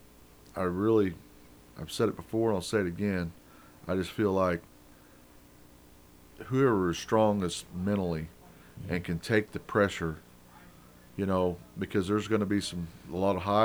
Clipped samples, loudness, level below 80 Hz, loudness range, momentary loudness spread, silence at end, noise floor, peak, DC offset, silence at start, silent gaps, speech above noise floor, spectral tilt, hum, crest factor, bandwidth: under 0.1%; -30 LUFS; -56 dBFS; 3 LU; 14 LU; 0 s; -56 dBFS; -10 dBFS; under 0.1%; 0.55 s; none; 27 dB; -6 dB/octave; 60 Hz at -65 dBFS; 20 dB; over 20 kHz